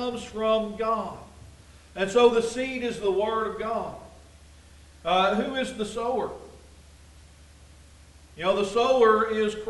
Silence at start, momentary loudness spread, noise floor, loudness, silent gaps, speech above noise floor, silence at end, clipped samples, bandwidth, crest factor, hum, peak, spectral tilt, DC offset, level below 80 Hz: 0 s; 15 LU; -51 dBFS; -25 LUFS; none; 26 dB; 0 s; under 0.1%; 11.5 kHz; 20 dB; none; -8 dBFS; -4.5 dB/octave; under 0.1%; -52 dBFS